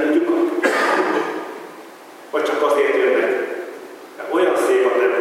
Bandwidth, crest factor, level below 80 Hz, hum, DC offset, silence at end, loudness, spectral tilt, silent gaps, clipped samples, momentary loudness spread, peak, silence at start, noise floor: 16 kHz; 14 dB; -86 dBFS; none; under 0.1%; 0 s; -18 LUFS; -3.5 dB/octave; none; under 0.1%; 19 LU; -4 dBFS; 0 s; -40 dBFS